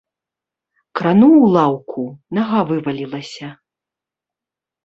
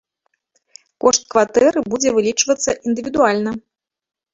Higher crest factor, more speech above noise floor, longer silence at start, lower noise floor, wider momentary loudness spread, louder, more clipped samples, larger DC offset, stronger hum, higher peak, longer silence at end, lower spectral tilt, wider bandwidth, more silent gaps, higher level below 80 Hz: about the same, 16 dB vs 18 dB; first, 72 dB vs 54 dB; about the same, 0.95 s vs 1.05 s; first, -87 dBFS vs -70 dBFS; first, 19 LU vs 7 LU; about the same, -15 LUFS vs -17 LUFS; neither; neither; neither; about the same, -2 dBFS vs 0 dBFS; first, 1.35 s vs 0.75 s; first, -8 dB/octave vs -2.5 dB/octave; about the same, 8 kHz vs 8 kHz; neither; second, -60 dBFS vs -54 dBFS